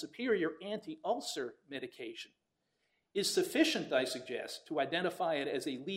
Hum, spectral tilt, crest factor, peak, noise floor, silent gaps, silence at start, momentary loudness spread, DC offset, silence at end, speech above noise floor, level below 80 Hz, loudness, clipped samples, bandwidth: none; -3.5 dB/octave; 20 dB; -16 dBFS; -82 dBFS; none; 0 s; 14 LU; under 0.1%; 0 s; 46 dB; -78 dBFS; -36 LUFS; under 0.1%; 16 kHz